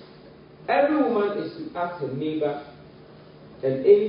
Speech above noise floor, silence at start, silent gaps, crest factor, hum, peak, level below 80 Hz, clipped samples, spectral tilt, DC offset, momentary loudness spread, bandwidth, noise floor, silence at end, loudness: 24 dB; 0 s; none; 20 dB; none; -6 dBFS; -64 dBFS; under 0.1%; -11 dB/octave; under 0.1%; 13 LU; 5.4 kHz; -48 dBFS; 0 s; -25 LUFS